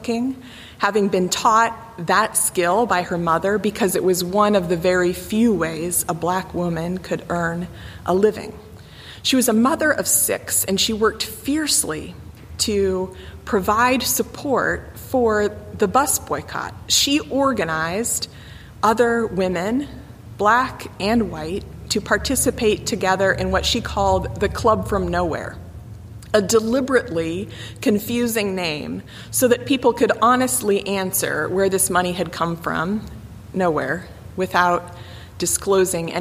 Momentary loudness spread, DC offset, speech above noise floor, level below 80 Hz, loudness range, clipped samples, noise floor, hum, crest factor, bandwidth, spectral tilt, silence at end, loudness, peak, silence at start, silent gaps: 13 LU; under 0.1%; 20 dB; -42 dBFS; 3 LU; under 0.1%; -40 dBFS; none; 18 dB; 15.5 kHz; -3.5 dB/octave; 0 s; -20 LUFS; -2 dBFS; 0 s; none